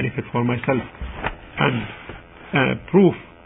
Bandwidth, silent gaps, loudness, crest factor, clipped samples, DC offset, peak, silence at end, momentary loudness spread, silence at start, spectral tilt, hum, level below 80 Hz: 4 kHz; none; -21 LUFS; 20 dB; under 0.1%; under 0.1%; -2 dBFS; 0.2 s; 17 LU; 0 s; -11.5 dB/octave; none; -42 dBFS